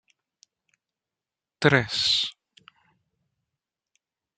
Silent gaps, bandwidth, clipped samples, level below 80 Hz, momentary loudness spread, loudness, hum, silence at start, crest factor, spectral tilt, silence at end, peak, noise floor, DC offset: none; 9.4 kHz; under 0.1%; -66 dBFS; 4 LU; -22 LUFS; none; 1.6 s; 26 dB; -4 dB/octave; 2.05 s; -4 dBFS; -89 dBFS; under 0.1%